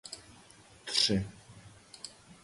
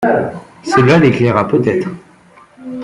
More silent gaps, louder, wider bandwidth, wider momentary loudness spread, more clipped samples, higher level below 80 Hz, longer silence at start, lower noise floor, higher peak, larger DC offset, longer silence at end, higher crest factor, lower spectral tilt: neither; second, -29 LUFS vs -13 LUFS; about the same, 11.5 kHz vs 11.5 kHz; first, 26 LU vs 19 LU; neither; second, -58 dBFS vs -48 dBFS; about the same, 0.05 s vs 0 s; first, -57 dBFS vs -44 dBFS; second, -12 dBFS vs 0 dBFS; neither; about the same, 0.1 s vs 0 s; first, 26 dB vs 14 dB; second, -3 dB/octave vs -7 dB/octave